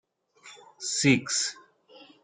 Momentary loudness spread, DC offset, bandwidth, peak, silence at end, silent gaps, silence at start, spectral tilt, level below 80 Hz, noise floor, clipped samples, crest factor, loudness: 10 LU; under 0.1%; 9.6 kHz; -8 dBFS; 0.2 s; none; 0.45 s; -3 dB/octave; -66 dBFS; -54 dBFS; under 0.1%; 22 dB; -26 LUFS